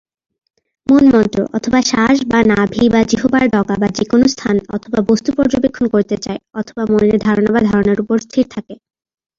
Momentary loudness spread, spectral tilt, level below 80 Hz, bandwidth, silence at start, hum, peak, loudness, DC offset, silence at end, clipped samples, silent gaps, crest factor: 8 LU; -5.5 dB/octave; -42 dBFS; 7.6 kHz; 0.9 s; none; 0 dBFS; -14 LUFS; under 0.1%; 0.65 s; under 0.1%; none; 14 dB